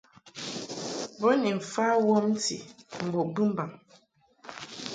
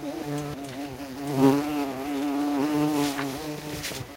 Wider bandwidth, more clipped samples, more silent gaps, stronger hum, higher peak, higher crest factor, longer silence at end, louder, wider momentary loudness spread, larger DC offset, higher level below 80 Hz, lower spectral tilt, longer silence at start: second, 9.4 kHz vs 16 kHz; neither; neither; neither; second, -12 dBFS vs -8 dBFS; about the same, 18 dB vs 20 dB; about the same, 0 s vs 0 s; about the same, -28 LUFS vs -27 LUFS; first, 18 LU vs 13 LU; neither; second, -74 dBFS vs -56 dBFS; about the same, -4.5 dB/octave vs -5.5 dB/octave; first, 0.25 s vs 0 s